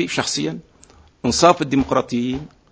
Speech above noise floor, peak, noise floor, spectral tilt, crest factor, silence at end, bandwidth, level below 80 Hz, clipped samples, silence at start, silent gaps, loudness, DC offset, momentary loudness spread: 31 dB; 0 dBFS; -50 dBFS; -4 dB/octave; 20 dB; 0.25 s; 8 kHz; -44 dBFS; under 0.1%; 0 s; none; -19 LUFS; under 0.1%; 13 LU